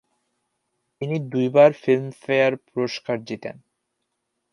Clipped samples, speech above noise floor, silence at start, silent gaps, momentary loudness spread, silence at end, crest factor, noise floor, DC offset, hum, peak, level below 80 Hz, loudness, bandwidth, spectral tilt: under 0.1%; 56 dB; 1 s; none; 17 LU; 1 s; 20 dB; -77 dBFS; under 0.1%; none; -2 dBFS; -72 dBFS; -21 LUFS; 11 kHz; -7 dB/octave